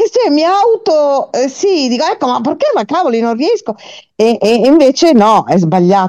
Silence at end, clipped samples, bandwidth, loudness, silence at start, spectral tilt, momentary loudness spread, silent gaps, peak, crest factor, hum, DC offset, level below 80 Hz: 0 s; under 0.1%; 12.5 kHz; -11 LUFS; 0 s; -5.5 dB/octave; 7 LU; none; 0 dBFS; 10 dB; none; under 0.1%; -54 dBFS